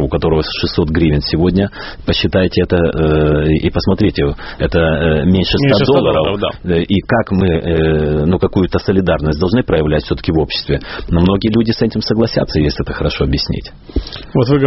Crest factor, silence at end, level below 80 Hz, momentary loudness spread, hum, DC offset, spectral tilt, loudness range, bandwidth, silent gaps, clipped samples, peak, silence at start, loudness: 14 dB; 0 s; -26 dBFS; 6 LU; none; under 0.1%; -5.5 dB/octave; 2 LU; 6 kHz; none; under 0.1%; 0 dBFS; 0 s; -14 LUFS